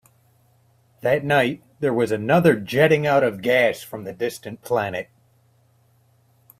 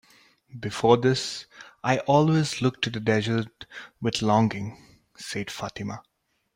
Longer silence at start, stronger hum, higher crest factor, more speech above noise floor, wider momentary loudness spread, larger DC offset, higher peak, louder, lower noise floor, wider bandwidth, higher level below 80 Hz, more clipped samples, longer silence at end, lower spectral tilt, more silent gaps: first, 1.05 s vs 0.55 s; neither; about the same, 20 dB vs 22 dB; first, 40 dB vs 33 dB; second, 13 LU vs 18 LU; neither; about the same, -2 dBFS vs -4 dBFS; first, -21 LUFS vs -25 LUFS; about the same, -60 dBFS vs -58 dBFS; about the same, 16 kHz vs 16 kHz; about the same, -62 dBFS vs -60 dBFS; neither; first, 1.55 s vs 0.55 s; about the same, -6 dB/octave vs -5.5 dB/octave; neither